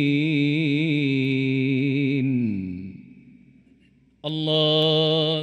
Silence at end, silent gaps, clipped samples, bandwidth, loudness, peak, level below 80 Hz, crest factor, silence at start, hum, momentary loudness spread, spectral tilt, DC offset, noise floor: 0 s; none; under 0.1%; 8.8 kHz; -22 LUFS; -8 dBFS; -66 dBFS; 14 dB; 0 s; none; 12 LU; -7.5 dB/octave; under 0.1%; -58 dBFS